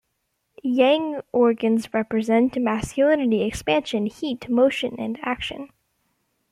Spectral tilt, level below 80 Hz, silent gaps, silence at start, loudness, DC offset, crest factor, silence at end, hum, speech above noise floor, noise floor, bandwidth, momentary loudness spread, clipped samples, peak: -5.5 dB/octave; -52 dBFS; none; 0.65 s; -22 LUFS; under 0.1%; 16 dB; 0.85 s; none; 53 dB; -74 dBFS; 13.5 kHz; 9 LU; under 0.1%; -6 dBFS